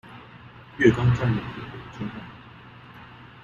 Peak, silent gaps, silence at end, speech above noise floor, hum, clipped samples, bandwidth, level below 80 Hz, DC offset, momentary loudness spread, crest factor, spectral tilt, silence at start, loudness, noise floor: -4 dBFS; none; 0.05 s; 24 dB; none; under 0.1%; 7.4 kHz; -48 dBFS; under 0.1%; 26 LU; 24 dB; -8 dB/octave; 0.05 s; -24 LUFS; -46 dBFS